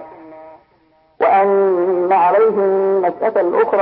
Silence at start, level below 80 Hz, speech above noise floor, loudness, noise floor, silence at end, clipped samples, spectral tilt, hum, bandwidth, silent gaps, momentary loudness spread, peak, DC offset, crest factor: 0 s; -66 dBFS; 40 dB; -15 LUFS; -55 dBFS; 0 s; under 0.1%; -11.5 dB/octave; none; 4.5 kHz; none; 4 LU; -4 dBFS; under 0.1%; 12 dB